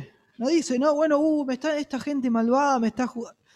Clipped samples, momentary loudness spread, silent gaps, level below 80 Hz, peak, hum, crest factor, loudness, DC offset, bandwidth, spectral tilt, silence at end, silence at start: under 0.1%; 8 LU; none; -66 dBFS; -10 dBFS; none; 14 dB; -24 LUFS; under 0.1%; 11 kHz; -4.5 dB/octave; 0.25 s; 0 s